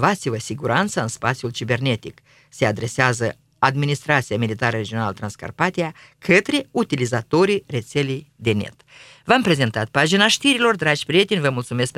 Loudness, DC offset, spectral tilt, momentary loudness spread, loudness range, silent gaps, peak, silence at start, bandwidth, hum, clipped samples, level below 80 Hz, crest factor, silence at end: -20 LUFS; under 0.1%; -4.5 dB/octave; 10 LU; 4 LU; none; 0 dBFS; 0 s; 15 kHz; none; under 0.1%; -56 dBFS; 20 dB; 0.1 s